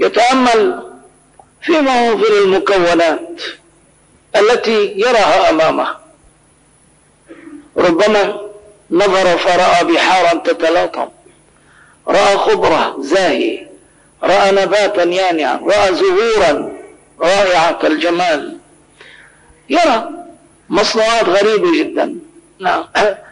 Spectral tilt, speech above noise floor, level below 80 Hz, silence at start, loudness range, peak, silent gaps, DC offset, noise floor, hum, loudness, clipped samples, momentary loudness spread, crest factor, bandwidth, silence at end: -3.5 dB/octave; 38 dB; -48 dBFS; 0 s; 3 LU; -4 dBFS; none; under 0.1%; -50 dBFS; none; -13 LUFS; under 0.1%; 11 LU; 10 dB; 10.5 kHz; 0.1 s